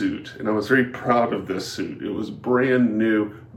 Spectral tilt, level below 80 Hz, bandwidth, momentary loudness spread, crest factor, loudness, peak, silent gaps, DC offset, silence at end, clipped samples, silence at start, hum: -6 dB/octave; -60 dBFS; 14 kHz; 10 LU; 18 dB; -22 LUFS; -4 dBFS; none; under 0.1%; 0 s; under 0.1%; 0 s; none